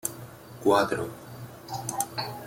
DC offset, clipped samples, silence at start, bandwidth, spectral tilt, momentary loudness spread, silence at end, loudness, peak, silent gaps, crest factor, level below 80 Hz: under 0.1%; under 0.1%; 0.05 s; 17 kHz; -4 dB/octave; 20 LU; 0 s; -28 LUFS; -8 dBFS; none; 22 dB; -62 dBFS